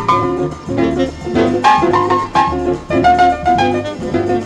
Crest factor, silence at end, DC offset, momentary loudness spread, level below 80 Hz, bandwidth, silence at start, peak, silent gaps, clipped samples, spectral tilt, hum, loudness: 14 dB; 0 s; under 0.1%; 8 LU; -34 dBFS; 10.5 kHz; 0 s; 0 dBFS; none; under 0.1%; -6 dB/octave; none; -14 LUFS